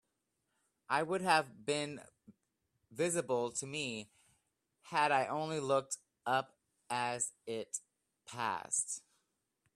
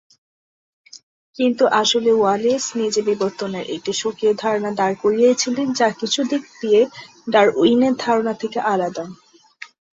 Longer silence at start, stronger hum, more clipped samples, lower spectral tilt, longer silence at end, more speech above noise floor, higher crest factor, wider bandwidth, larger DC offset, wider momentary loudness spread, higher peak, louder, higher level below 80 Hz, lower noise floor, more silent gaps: about the same, 0.9 s vs 0.95 s; neither; neither; about the same, -3 dB/octave vs -3.5 dB/octave; first, 0.75 s vs 0.25 s; first, 48 dB vs 24 dB; first, 24 dB vs 18 dB; first, 14.5 kHz vs 8 kHz; neither; about the same, 12 LU vs 10 LU; second, -14 dBFS vs -2 dBFS; second, -36 LUFS vs -19 LUFS; second, -80 dBFS vs -64 dBFS; first, -84 dBFS vs -43 dBFS; second, none vs 1.03-1.33 s